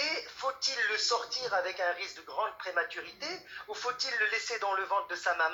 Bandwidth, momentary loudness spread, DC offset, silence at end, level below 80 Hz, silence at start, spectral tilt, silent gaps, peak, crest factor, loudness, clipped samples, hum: 17.5 kHz; 10 LU; under 0.1%; 0 s; -76 dBFS; 0 s; 0.5 dB/octave; none; -18 dBFS; 16 dB; -32 LUFS; under 0.1%; none